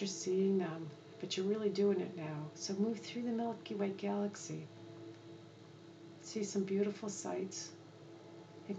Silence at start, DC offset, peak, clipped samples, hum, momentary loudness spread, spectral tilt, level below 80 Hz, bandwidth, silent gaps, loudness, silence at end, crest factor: 0 s; under 0.1%; -24 dBFS; under 0.1%; none; 21 LU; -5 dB/octave; -90 dBFS; 8.8 kHz; none; -39 LUFS; 0 s; 16 dB